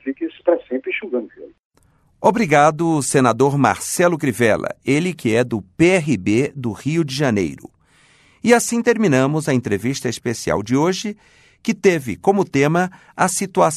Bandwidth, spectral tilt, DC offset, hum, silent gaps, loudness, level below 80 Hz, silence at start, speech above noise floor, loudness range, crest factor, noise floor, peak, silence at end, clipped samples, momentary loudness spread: 13.5 kHz; -5 dB/octave; under 0.1%; none; 1.65-1.70 s; -18 LUFS; -54 dBFS; 0.05 s; 40 dB; 3 LU; 18 dB; -57 dBFS; -2 dBFS; 0 s; under 0.1%; 9 LU